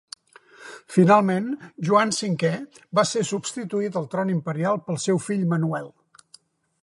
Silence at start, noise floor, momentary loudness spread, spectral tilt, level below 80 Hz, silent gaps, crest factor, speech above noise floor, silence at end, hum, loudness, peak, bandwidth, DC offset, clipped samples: 0.6 s; -56 dBFS; 15 LU; -5.5 dB/octave; -72 dBFS; none; 20 dB; 33 dB; 0.95 s; none; -23 LUFS; -4 dBFS; 11.5 kHz; under 0.1%; under 0.1%